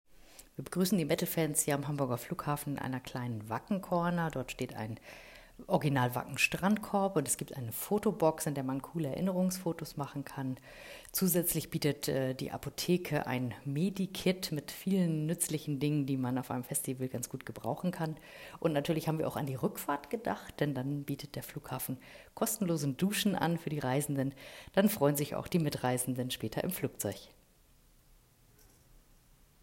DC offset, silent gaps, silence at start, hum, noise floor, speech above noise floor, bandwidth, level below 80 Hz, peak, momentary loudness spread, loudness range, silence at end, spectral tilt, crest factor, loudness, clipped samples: under 0.1%; none; 0.3 s; none; -64 dBFS; 30 dB; 16.5 kHz; -62 dBFS; -14 dBFS; 10 LU; 4 LU; 2.35 s; -5 dB/octave; 20 dB; -34 LUFS; under 0.1%